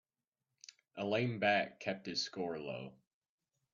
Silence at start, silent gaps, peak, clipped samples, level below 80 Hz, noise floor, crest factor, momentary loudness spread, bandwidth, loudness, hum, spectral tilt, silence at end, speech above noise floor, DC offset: 0.95 s; none; -18 dBFS; under 0.1%; -80 dBFS; under -90 dBFS; 22 dB; 22 LU; 7.4 kHz; -37 LUFS; none; -4.5 dB/octave; 0.8 s; over 53 dB; under 0.1%